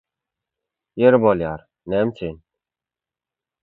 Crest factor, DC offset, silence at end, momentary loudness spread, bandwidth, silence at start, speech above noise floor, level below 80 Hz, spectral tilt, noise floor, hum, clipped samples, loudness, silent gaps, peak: 22 dB; under 0.1%; 1.25 s; 18 LU; 4.2 kHz; 0.95 s; 71 dB; -52 dBFS; -10 dB/octave; -89 dBFS; none; under 0.1%; -19 LUFS; none; 0 dBFS